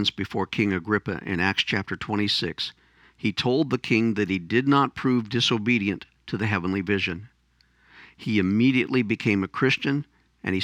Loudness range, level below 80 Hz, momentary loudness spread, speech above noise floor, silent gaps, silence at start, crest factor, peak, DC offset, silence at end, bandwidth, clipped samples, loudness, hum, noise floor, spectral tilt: 3 LU; -58 dBFS; 8 LU; 39 dB; none; 0 s; 18 dB; -6 dBFS; under 0.1%; 0 s; 11.5 kHz; under 0.1%; -24 LUFS; none; -63 dBFS; -5.5 dB/octave